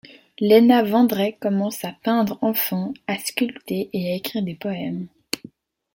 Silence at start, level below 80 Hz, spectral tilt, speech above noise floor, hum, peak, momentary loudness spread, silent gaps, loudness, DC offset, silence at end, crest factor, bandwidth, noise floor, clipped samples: 0.4 s; -66 dBFS; -5.5 dB/octave; 26 dB; none; -2 dBFS; 14 LU; none; -21 LUFS; under 0.1%; 0.6 s; 20 dB; 17 kHz; -46 dBFS; under 0.1%